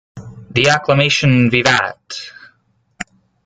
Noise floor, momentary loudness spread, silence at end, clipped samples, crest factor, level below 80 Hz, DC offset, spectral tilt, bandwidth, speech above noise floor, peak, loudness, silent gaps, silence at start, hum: -59 dBFS; 19 LU; 0.4 s; under 0.1%; 16 dB; -48 dBFS; under 0.1%; -4.5 dB/octave; 9.4 kHz; 45 dB; 0 dBFS; -13 LUFS; none; 0.15 s; none